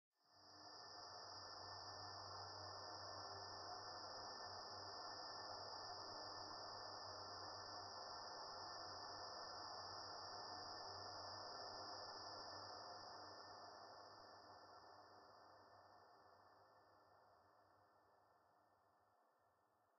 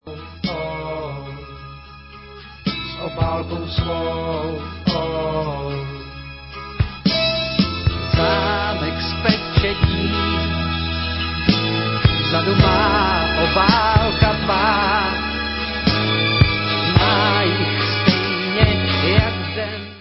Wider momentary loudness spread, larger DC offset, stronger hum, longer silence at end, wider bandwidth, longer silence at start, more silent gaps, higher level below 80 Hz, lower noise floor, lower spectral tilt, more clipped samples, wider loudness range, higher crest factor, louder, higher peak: about the same, 12 LU vs 14 LU; neither; neither; first, 0.15 s vs 0 s; first, 6.4 kHz vs 5.8 kHz; first, 0.25 s vs 0.05 s; neither; second, -86 dBFS vs -30 dBFS; first, -81 dBFS vs -39 dBFS; second, -0.5 dB/octave vs -9 dB/octave; neither; about the same, 11 LU vs 9 LU; about the same, 16 dB vs 20 dB; second, -54 LUFS vs -18 LUFS; second, -42 dBFS vs 0 dBFS